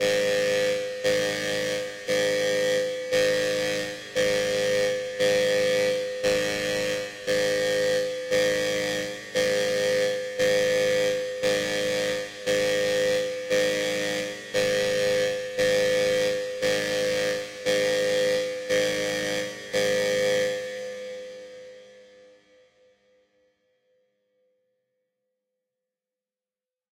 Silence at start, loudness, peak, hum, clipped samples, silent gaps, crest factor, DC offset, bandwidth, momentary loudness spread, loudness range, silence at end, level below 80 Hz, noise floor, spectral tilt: 0 s; -25 LUFS; -10 dBFS; none; under 0.1%; none; 16 dB; under 0.1%; 16 kHz; 6 LU; 3 LU; 4.95 s; -60 dBFS; under -90 dBFS; -2.5 dB/octave